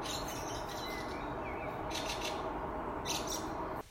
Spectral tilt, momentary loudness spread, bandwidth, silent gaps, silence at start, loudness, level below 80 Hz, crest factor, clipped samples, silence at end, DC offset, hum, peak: -3 dB/octave; 4 LU; 16 kHz; none; 0 s; -39 LUFS; -52 dBFS; 16 dB; under 0.1%; 0 s; under 0.1%; none; -24 dBFS